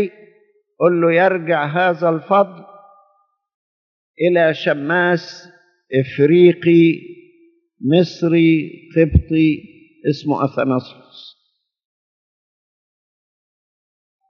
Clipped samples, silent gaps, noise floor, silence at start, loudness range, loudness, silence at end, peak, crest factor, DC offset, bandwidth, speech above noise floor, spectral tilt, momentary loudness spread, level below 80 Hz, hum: under 0.1%; 3.54-4.14 s; -69 dBFS; 0 s; 9 LU; -16 LUFS; 3.1 s; 0 dBFS; 18 dB; under 0.1%; 6.4 kHz; 54 dB; -6 dB/octave; 10 LU; -38 dBFS; none